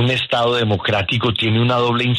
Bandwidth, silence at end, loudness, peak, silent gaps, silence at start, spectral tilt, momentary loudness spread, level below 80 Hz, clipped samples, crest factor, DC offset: 11 kHz; 0 s; -17 LUFS; -6 dBFS; none; 0 s; -6.5 dB/octave; 2 LU; -48 dBFS; under 0.1%; 12 dB; under 0.1%